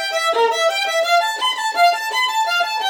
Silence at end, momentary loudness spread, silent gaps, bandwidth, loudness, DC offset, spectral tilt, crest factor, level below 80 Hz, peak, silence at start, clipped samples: 0 s; 3 LU; none; 17.5 kHz; -17 LUFS; under 0.1%; 3 dB/octave; 16 dB; -86 dBFS; -2 dBFS; 0 s; under 0.1%